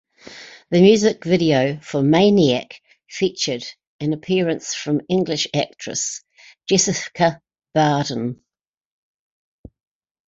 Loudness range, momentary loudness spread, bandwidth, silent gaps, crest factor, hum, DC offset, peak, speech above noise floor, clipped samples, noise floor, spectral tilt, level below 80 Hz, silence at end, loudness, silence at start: 5 LU; 21 LU; 8 kHz; 3.87-3.99 s; 18 dB; none; under 0.1%; -2 dBFS; 23 dB; under 0.1%; -41 dBFS; -4.5 dB/octave; -58 dBFS; 1.95 s; -19 LUFS; 0.25 s